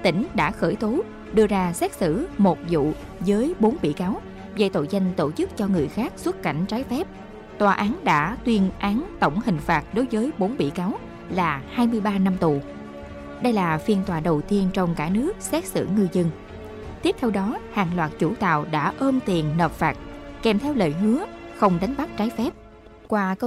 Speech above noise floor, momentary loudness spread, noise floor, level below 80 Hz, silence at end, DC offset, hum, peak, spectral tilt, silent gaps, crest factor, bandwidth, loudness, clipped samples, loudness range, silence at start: 23 dB; 7 LU; -46 dBFS; -44 dBFS; 0 s; under 0.1%; none; -8 dBFS; -6.5 dB/octave; none; 16 dB; 14.5 kHz; -23 LUFS; under 0.1%; 2 LU; 0 s